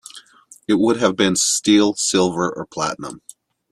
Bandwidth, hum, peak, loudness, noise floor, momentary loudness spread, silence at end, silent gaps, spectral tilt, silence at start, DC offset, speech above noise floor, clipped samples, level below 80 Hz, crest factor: 13 kHz; none; -2 dBFS; -18 LUFS; -46 dBFS; 19 LU; 0.55 s; none; -3.5 dB/octave; 0.15 s; under 0.1%; 28 dB; under 0.1%; -58 dBFS; 16 dB